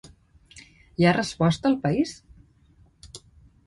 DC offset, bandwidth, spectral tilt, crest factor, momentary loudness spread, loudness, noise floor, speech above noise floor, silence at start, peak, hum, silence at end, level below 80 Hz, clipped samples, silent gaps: under 0.1%; 11.5 kHz; -6 dB/octave; 20 dB; 24 LU; -23 LUFS; -58 dBFS; 36 dB; 0.05 s; -6 dBFS; none; 0.5 s; -54 dBFS; under 0.1%; none